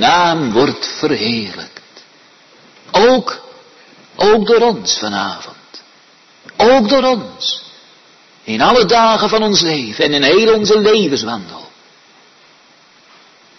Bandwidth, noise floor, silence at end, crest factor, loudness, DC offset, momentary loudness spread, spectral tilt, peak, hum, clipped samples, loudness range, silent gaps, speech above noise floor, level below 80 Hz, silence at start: 6.4 kHz; -47 dBFS; 1.95 s; 14 dB; -13 LUFS; under 0.1%; 16 LU; -3.5 dB/octave; 0 dBFS; none; under 0.1%; 5 LU; none; 35 dB; -48 dBFS; 0 s